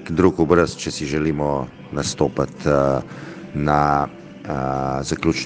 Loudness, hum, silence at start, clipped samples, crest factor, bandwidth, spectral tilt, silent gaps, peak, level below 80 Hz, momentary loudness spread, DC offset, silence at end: -21 LUFS; none; 0 s; under 0.1%; 20 dB; 10 kHz; -6 dB/octave; none; 0 dBFS; -42 dBFS; 12 LU; under 0.1%; 0 s